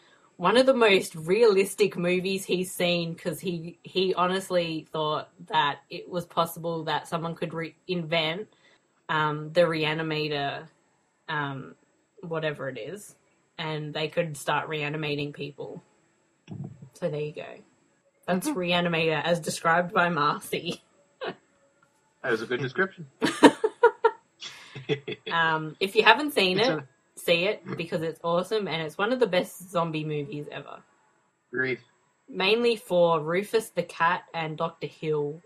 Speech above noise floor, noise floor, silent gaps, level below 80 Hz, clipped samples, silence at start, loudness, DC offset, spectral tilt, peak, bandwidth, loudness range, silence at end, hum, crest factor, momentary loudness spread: 42 dB; -68 dBFS; none; -70 dBFS; under 0.1%; 0.4 s; -26 LUFS; under 0.1%; -4.5 dB/octave; 0 dBFS; 15 kHz; 8 LU; 0.05 s; none; 28 dB; 17 LU